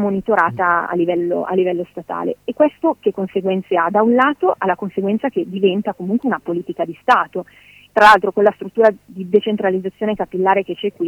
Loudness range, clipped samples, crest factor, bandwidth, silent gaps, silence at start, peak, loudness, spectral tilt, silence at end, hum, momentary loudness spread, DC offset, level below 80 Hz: 3 LU; under 0.1%; 16 dB; 16 kHz; none; 0 s; -2 dBFS; -17 LUFS; -6.5 dB/octave; 0 s; none; 10 LU; under 0.1%; -58 dBFS